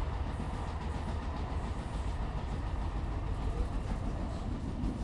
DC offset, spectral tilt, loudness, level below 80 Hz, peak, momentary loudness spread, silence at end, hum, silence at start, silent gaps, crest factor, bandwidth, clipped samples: under 0.1%; -7 dB/octave; -38 LUFS; -38 dBFS; -22 dBFS; 1 LU; 0 s; none; 0 s; none; 14 dB; 11 kHz; under 0.1%